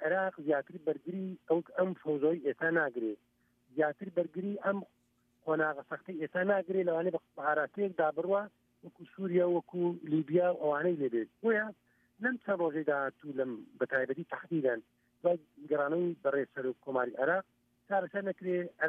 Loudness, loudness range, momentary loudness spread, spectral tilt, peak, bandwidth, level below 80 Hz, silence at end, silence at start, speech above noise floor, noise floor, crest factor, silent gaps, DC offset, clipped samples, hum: -34 LUFS; 2 LU; 8 LU; -9.5 dB/octave; -16 dBFS; 3.8 kHz; -86 dBFS; 0 s; 0 s; 40 dB; -73 dBFS; 16 dB; none; under 0.1%; under 0.1%; none